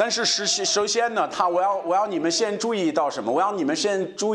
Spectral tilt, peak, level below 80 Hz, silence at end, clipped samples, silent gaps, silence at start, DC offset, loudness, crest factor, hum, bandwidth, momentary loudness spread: -2 dB/octave; -8 dBFS; -70 dBFS; 0 s; under 0.1%; none; 0 s; under 0.1%; -22 LUFS; 16 dB; none; 11.5 kHz; 3 LU